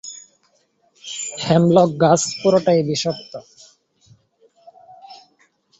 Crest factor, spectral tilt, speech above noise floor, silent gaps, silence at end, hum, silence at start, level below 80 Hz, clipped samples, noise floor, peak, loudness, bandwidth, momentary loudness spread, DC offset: 18 dB; -5 dB/octave; 46 dB; none; 0.65 s; none; 0.05 s; -58 dBFS; under 0.1%; -63 dBFS; -2 dBFS; -17 LUFS; 8.2 kHz; 23 LU; under 0.1%